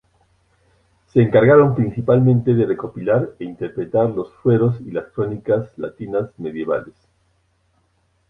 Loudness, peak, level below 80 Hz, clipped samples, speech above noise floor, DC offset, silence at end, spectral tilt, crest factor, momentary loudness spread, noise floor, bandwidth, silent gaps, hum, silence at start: -18 LUFS; -2 dBFS; -52 dBFS; under 0.1%; 46 dB; under 0.1%; 1.4 s; -11 dB/octave; 16 dB; 14 LU; -64 dBFS; 3.9 kHz; none; none; 1.15 s